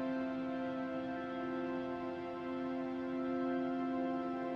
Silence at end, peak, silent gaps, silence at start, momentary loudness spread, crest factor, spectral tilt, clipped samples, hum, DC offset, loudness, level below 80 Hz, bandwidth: 0 s; -28 dBFS; none; 0 s; 4 LU; 10 dB; -7.5 dB/octave; under 0.1%; none; under 0.1%; -39 LUFS; -70 dBFS; 6.2 kHz